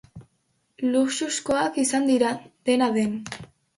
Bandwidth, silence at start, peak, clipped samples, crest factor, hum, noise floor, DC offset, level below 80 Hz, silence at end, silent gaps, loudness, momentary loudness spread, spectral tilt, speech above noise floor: 11.5 kHz; 0.15 s; -8 dBFS; under 0.1%; 16 dB; none; -71 dBFS; under 0.1%; -62 dBFS; 0.35 s; none; -24 LUFS; 9 LU; -3.5 dB/octave; 47 dB